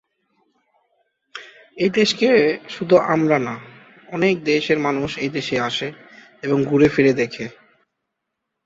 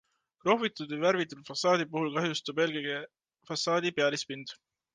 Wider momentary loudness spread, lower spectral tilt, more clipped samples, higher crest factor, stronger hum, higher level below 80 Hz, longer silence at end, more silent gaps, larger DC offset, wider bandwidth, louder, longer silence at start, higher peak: first, 17 LU vs 11 LU; first, -5.5 dB/octave vs -4 dB/octave; neither; about the same, 18 dB vs 20 dB; neither; first, -56 dBFS vs -78 dBFS; first, 1.15 s vs 0.4 s; neither; neither; second, 8 kHz vs 10 kHz; first, -19 LUFS vs -30 LUFS; first, 1.35 s vs 0.45 s; first, -2 dBFS vs -12 dBFS